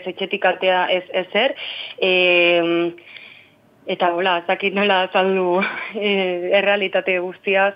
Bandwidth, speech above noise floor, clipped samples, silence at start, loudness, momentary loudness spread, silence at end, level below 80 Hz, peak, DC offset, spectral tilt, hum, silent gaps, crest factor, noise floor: 5.4 kHz; 32 dB; under 0.1%; 0 s; -18 LUFS; 11 LU; 0 s; -76 dBFS; -2 dBFS; under 0.1%; -7 dB/octave; none; none; 18 dB; -51 dBFS